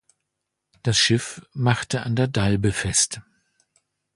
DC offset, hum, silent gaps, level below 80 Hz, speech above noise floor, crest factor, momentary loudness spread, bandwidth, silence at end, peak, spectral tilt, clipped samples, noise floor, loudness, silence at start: under 0.1%; none; none; -46 dBFS; 59 dB; 20 dB; 8 LU; 11.5 kHz; 0.95 s; -4 dBFS; -3.5 dB/octave; under 0.1%; -81 dBFS; -22 LUFS; 0.85 s